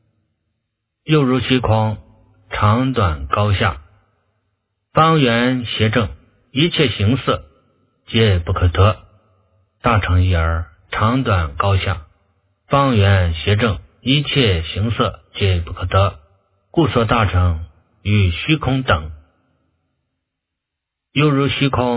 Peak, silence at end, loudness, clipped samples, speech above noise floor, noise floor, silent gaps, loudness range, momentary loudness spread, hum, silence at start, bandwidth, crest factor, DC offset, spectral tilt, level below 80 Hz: 0 dBFS; 0 s; -17 LUFS; under 0.1%; 65 dB; -81 dBFS; none; 3 LU; 9 LU; none; 1.05 s; 4 kHz; 18 dB; under 0.1%; -10.5 dB/octave; -30 dBFS